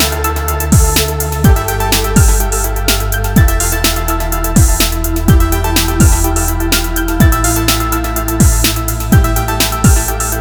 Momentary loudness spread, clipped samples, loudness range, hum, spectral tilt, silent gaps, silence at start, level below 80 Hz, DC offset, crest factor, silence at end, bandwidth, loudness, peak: 5 LU; under 0.1%; 1 LU; none; -4 dB/octave; none; 0 s; -14 dBFS; under 0.1%; 12 dB; 0 s; over 20 kHz; -12 LUFS; 0 dBFS